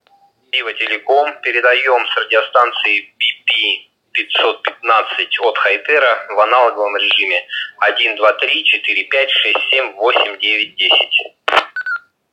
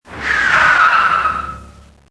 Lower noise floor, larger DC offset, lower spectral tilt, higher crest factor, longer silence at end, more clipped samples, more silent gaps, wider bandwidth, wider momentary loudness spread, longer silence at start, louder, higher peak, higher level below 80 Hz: first, -53 dBFS vs -40 dBFS; neither; second, -1 dB/octave vs -2.5 dB/octave; about the same, 16 dB vs 14 dB; about the same, 0.35 s vs 0.4 s; neither; neither; second, 9.6 kHz vs 11 kHz; second, 6 LU vs 12 LU; first, 0.55 s vs 0.1 s; about the same, -14 LUFS vs -12 LUFS; about the same, 0 dBFS vs 0 dBFS; second, -70 dBFS vs -40 dBFS